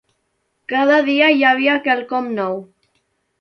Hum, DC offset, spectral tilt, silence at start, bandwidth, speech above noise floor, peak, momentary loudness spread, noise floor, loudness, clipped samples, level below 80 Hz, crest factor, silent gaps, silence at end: none; under 0.1%; -5.5 dB/octave; 0.7 s; 6.6 kHz; 53 dB; -2 dBFS; 12 LU; -69 dBFS; -16 LUFS; under 0.1%; -70 dBFS; 16 dB; none; 0.75 s